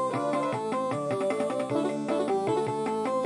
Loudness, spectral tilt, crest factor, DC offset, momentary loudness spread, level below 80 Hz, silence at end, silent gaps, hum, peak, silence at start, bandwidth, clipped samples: -29 LUFS; -6 dB/octave; 14 dB; under 0.1%; 2 LU; -74 dBFS; 0 s; none; none; -14 dBFS; 0 s; 11.5 kHz; under 0.1%